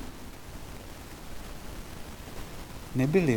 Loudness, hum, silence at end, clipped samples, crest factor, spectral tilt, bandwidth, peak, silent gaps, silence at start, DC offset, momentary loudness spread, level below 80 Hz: -36 LUFS; none; 0 s; under 0.1%; 20 dB; -6.5 dB/octave; 19 kHz; -12 dBFS; none; 0 s; under 0.1%; 16 LU; -46 dBFS